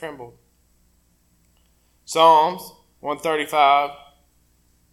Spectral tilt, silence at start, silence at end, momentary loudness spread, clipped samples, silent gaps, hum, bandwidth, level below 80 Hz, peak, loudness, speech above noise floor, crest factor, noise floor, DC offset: -3 dB/octave; 0 s; 1 s; 21 LU; under 0.1%; none; 60 Hz at -65 dBFS; 16 kHz; -62 dBFS; -2 dBFS; -18 LUFS; 43 dB; 20 dB; -61 dBFS; under 0.1%